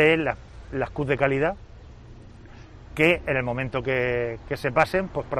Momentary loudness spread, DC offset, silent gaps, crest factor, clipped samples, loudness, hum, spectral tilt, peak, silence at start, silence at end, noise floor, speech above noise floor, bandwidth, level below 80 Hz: 10 LU; under 0.1%; none; 20 dB; under 0.1%; -24 LUFS; none; -6.5 dB/octave; -6 dBFS; 0 s; 0 s; -45 dBFS; 21 dB; 13 kHz; -44 dBFS